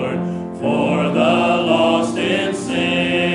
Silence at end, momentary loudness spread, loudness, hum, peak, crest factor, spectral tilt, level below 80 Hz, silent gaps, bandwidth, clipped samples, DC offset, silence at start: 0 s; 7 LU; -17 LUFS; none; -2 dBFS; 14 dB; -5.5 dB/octave; -56 dBFS; none; 11 kHz; under 0.1%; under 0.1%; 0 s